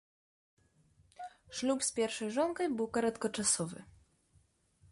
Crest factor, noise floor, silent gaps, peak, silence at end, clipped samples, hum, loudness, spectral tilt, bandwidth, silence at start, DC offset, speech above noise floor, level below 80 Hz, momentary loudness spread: 20 dB; -70 dBFS; none; -16 dBFS; 1 s; under 0.1%; none; -34 LUFS; -3 dB/octave; 11.5 kHz; 1.2 s; under 0.1%; 36 dB; -70 dBFS; 19 LU